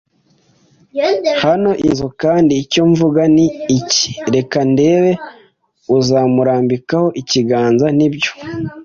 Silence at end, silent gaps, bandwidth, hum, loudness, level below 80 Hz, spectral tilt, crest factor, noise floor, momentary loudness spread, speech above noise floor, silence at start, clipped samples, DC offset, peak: 0 s; none; 7.4 kHz; none; -14 LUFS; -48 dBFS; -5.5 dB/octave; 12 dB; -56 dBFS; 7 LU; 42 dB; 0.95 s; under 0.1%; under 0.1%; -2 dBFS